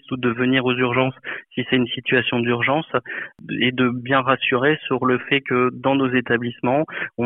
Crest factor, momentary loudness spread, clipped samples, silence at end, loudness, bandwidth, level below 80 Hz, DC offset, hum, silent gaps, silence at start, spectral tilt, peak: 18 dB; 7 LU; under 0.1%; 0 s; -20 LUFS; 4 kHz; -60 dBFS; under 0.1%; none; none; 0.1 s; -10 dB/octave; -2 dBFS